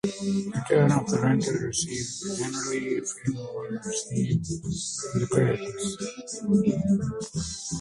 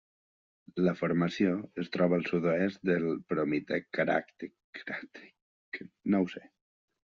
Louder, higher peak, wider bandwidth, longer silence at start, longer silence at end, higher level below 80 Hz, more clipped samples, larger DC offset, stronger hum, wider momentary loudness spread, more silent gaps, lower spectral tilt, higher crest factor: first, -27 LUFS vs -31 LUFS; first, -8 dBFS vs -14 dBFS; first, 11.5 kHz vs 7.2 kHz; second, 0.05 s vs 0.75 s; second, 0 s vs 0.65 s; first, -52 dBFS vs -72 dBFS; neither; neither; neither; second, 9 LU vs 16 LU; second, none vs 4.64-4.73 s, 5.42-5.72 s; about the same, -5.5 dB/octave vs -6 dB/octave; about the same, 20 dB vs 18 dB